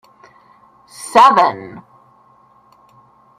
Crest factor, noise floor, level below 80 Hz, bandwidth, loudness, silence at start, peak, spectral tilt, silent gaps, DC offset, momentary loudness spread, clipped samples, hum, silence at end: 18 dB; -51 dBFS; -64 dBFS; 15.5 kHz; -11 LUFS; 1 s; 0 dBFS; -3.5 dB/octave; none; under 0.1%; 24 LU; under 0.1%; none; 1.6 s